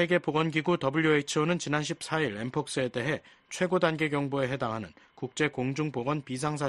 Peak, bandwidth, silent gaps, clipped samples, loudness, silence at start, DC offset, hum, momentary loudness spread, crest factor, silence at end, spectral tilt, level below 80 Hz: -10 dBFS; 11.5 kHz; none; under 0.1%; -29 LUFS; 0 s; under 0.1%; none; 8 LU; 20 dB; 0 s; -5 dB/octave; -64 dBFS